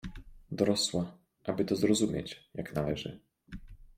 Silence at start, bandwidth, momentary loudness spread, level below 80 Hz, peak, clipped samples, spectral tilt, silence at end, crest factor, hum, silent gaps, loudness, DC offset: 0.05 s; 16 kHz; 21 LU; -54 dBFS; -12 dBFS; under 0.1%; -5 dB/octave; 0.15 s; 22 dB; none; none; -32 LUFS; under 0.1%